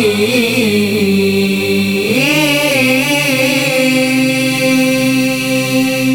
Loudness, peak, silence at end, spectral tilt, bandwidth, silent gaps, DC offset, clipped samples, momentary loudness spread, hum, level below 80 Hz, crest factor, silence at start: -12 LUFS; 0 dBFS; 0 s; -4 dB/octave; 20 kHz; none; under 0.1%; under 0.1%; 3 LU; none; -48 dBFS; 12 dB; 0 s